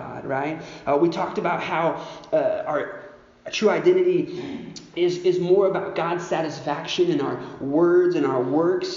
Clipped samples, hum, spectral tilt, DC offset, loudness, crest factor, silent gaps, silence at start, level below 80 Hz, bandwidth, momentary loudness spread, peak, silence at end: under 0.1%; none; -4.5 dB/octave; under 0.1%; -23 LUFS; 16 dB; none; 0 s; -62 dBFS; 7.4 kHz; 12 LU; -6 dBFS; 0 s